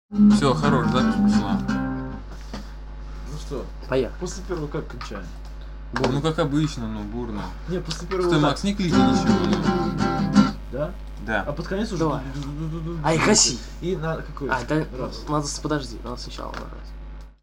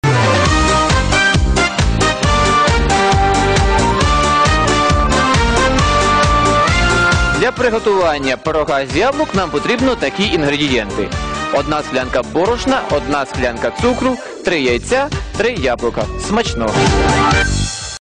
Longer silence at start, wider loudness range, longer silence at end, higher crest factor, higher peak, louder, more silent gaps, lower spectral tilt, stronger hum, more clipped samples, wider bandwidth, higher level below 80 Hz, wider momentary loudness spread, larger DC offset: about the same, 0.1 s vs 0.05 s; first, 8 LU vs 4 LU; about the same, 0.1 s vs 0 s; first, 20 dB vs 10 dB; about the same, -4 dBFS vs -4 dBFS; second, -23 LUFS vs -14 LUFS; neither; about the same, -5 dB/octave vs -4.5 dB/octave; neither; neither; first, 11.5 kHz vs 10 kHz; second, -36 dBFS vs -22 dBFS; first, 18 LU vs 6 LU; neither